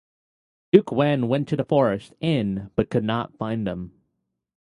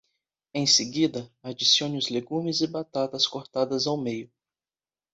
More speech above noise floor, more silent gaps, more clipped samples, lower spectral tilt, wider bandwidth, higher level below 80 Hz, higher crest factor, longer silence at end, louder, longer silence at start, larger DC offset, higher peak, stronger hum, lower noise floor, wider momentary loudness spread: second, 55 dB vs over 64 dB; neither; neither; first, -8.5 dB/octave vs -3 dB/octave; first, 11 kHz vs 8.2 kHz; first, -52 dBFS vs -70 dBFS; about the same, 22 dB vs 22 dB; about the same, 0.85 s vs 0.9 s; about the same, -23 LUFS vs -25 LUFS; first, 0.75 s vs 0.55 s; neither; first, 0 dBFS vs -6 dBFS; neither; second, -77 dBFS vs under -90 dBFS; second, 9 LU vs 13 LU